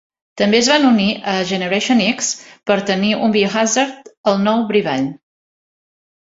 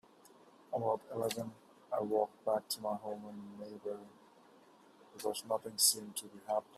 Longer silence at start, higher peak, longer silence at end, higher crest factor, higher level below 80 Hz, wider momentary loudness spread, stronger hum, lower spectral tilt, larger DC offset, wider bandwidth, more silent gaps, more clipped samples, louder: second, 0.35 s vs 0.7 s; first, 0 dBFS vs -14 dBFS; first, 1.15 s vs 0 s; second, 16 dB vs 24 dB; first, -58 dBFS vs -84 dBFS; second, 9 LU vs 18 LU; neither; about the same, -3.5 dB/octave vs -2.5 dB/octave; neither; second, 8 kHz vs 15.5 kHz; first, 4.17-4.24 s vs none; neither; first, -16 LUFS vs -37 LUFS